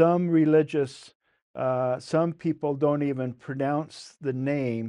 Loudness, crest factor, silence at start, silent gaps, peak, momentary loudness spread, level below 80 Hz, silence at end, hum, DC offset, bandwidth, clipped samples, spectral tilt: -26 LUFS; 18 dB; 0 s; 1.15-1.20 s, 1.42-1.54 s; -8 dBFS; 12 LU; -70 dBFS; 0 s; none; under 0.1%; 10.5 kHz; under 0.1%; -8 dB/octave